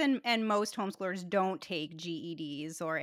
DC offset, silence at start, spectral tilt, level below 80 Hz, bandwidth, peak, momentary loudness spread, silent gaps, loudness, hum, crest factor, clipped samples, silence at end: under 0.1%; 0 s; -4.5 dB/octave; -82 dBFS; 15.5 kHz; -16 dBFS; 10 LU; none; -34 LUFS; none; 18 dB; under 0.1%; 0 s